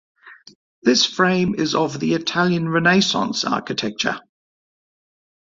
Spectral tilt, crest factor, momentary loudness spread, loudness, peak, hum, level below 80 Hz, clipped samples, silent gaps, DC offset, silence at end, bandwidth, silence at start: -4 dB/octave; 20 dB; 7 LU; -19 LUFS; -2 dBFS; none; -58 dBFS; under 0.1%; 0.55-0.82 s; under 0.1%; 1.2 s; 7.8 kHz; 0.25 s